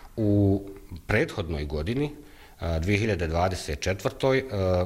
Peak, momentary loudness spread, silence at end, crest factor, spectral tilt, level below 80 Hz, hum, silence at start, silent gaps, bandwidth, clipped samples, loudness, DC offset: -6 dBFS; 9 LU; 0 s; 20 dB; -6.5 dB/octave; -40 dBFS; none; 0 s; none; 15.5 kHz; under 0.1%; -27 LUFS; under 0.1%